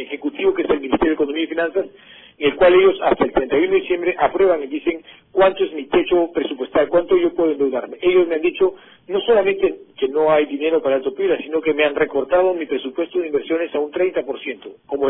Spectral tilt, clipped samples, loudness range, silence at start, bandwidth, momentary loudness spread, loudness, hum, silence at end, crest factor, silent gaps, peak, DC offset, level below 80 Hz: -9 dB/octave; under 0.1%; 3 LU; 0 s; 4.1 kHz; 8 LU; -18 LUFS; none; 0 s; 14 dB; none; -4 dBFS; under 0.1%; -48 dBFS